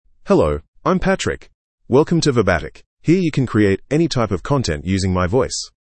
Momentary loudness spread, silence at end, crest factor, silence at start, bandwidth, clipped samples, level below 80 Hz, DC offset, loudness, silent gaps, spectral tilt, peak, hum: 7 LU; 0.25 s; 16 dB; 0.25 s; 8.8 kHz; under 0.1%; -38 dBFS; under 0.1%; -18 LUFS; 0.68-0.73 s, 1.54-1.78 s, 2.86-2.97 s; -6 dB/octave; -2 dBFS; none